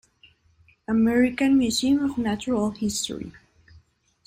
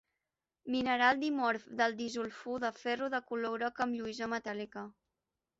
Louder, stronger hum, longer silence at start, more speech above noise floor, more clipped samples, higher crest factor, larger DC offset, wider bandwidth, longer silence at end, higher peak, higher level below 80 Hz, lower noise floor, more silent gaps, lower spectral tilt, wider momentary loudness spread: first, -23 LUFS vs -34 LUFS; neither; first, 0.9 s vs 0.65 s; second, 38 dB vs 55 dB; neither; about the same, 16 dB vs 20 dB; neither; first, 16 kHz vs 8 kHz; first, 0.9 s vs 0.7 s; first, -10 dBFS vs -14 dBFS; first, -54 dBFS vs -74 dBFS; second, -60 dBFS vs -90 dBFS; neither; first, -4 dB/octave vs -1.5 dB/octave; about the same, 13 LU vs 13 LU